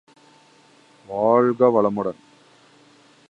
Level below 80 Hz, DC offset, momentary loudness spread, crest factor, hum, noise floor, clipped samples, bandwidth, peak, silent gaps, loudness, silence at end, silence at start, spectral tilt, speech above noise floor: -68 dBFS; under 0.1%; 12 LU; 20 dB; none; -54 dBFS; under 0.1%; 8 kHz; -4 dBFS; none; -20 LUFS; 1.2 s; 1.1 s; -8.5 dB/octave; 35 dB